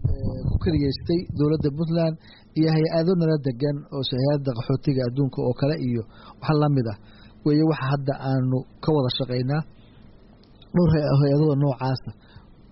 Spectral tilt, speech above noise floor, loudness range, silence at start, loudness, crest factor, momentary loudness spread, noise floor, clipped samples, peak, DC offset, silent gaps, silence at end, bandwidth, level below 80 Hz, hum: -7.5 dB/octave; 27 dB; 2 LU; 0 s; -23 LUFS; 12 dB; 8 LU; -50 dBFS; under 0.1%; -10 dBFS; under 0.1%; none; 0.6 s; 5.8 kHz; -40 dBFS; none